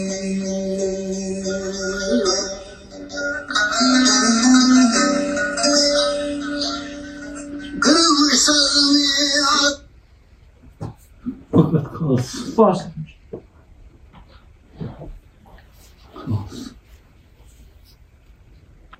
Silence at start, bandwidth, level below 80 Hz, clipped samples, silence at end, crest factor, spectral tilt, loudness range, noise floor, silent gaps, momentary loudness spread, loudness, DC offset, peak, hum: 0 s; 12.5 kHz; -46 dBFS; under 0.1%; 2.05 s; 18 dB; -3 dB/octave; 19 LU; -49 dBFS; none; 22 LU; -17 LUFS; under 0.1%; -2 dBFS; none